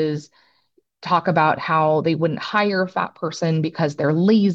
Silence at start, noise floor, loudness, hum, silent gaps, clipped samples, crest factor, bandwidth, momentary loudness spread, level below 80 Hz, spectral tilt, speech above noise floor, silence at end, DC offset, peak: 0 s; -64 dBFS; -20 LUFS; none; none; under 0.1%; 18 dB; 7.8 kHz; 8 LU; -66 dBFS; -7 dB/octave; 45 dB; 0 s; under 0.1%; -2 dBFS